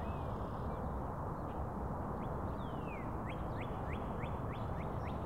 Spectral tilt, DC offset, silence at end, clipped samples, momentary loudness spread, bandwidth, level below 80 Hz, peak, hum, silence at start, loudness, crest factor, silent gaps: -8.5 dB/octave; 0.2%; 0 s; under 0.1%; 1 LU; 16 kHz; -48 dBFS; -28 dBFS; none; 0 s; -42 LUFS; 12 dB; none